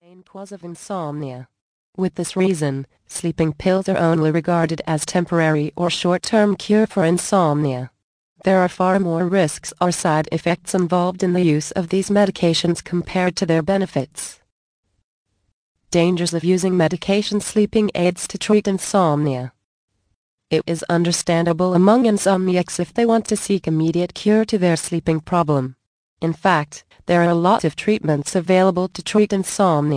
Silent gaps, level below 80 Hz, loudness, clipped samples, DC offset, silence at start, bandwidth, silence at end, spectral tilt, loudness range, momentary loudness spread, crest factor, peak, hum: 1.61-1.93 s, 8.03-8.36 s, 14.52-14.83 s, 15.04-15.26 s, 15.53-15.75 s, 19.64-19.88 s, 20.15-20.38 s, 25.87-26.17 s; -52 dBFS; -19 LUFS; under 0.1%; under 0.1%; 0.35 s; 10.5 kHz; 0 s; -5.5 dB/octave; 4 LU; 9 LU; 18 dB; -2 dBFS; none